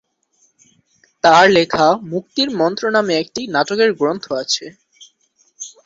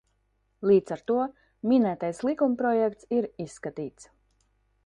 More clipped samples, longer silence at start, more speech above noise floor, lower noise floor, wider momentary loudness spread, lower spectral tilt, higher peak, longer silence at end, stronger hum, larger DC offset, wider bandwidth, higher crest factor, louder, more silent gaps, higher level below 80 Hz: neither; first, 1.25 s vs 0.6 s; about the same, 45 dB vs 46 dB; second, -61 dBFS vs -72 dBFS; about the same, 11 LU vs 13 LU; second, -3.5 dB/octave vs -7 dB/octave; first, 0 dBFS vs -10 dBFS; second, 0.15 s vs 0.85 s; neither; neither; second, 7.8 kHz vs 10.5 kHz; about the same, 16 dB vs 18 dB; first, -16 LUFS vs -27 LUFS; neither; first, -58 dBFS vs -66 dBFS